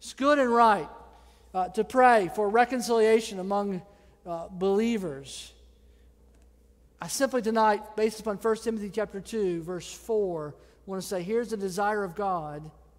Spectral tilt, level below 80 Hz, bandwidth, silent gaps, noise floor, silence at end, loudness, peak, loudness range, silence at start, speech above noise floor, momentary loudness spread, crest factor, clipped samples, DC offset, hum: -4.5 dB/octave; -58 dBFS; 16 kHz; none; -59 dBFS; 0.3 s; -27 LUFS; -8 dBFS; 8 LU; 0 s; 32 dB; 17 LU; 20 dB; under 0.1%; under 0.1%; none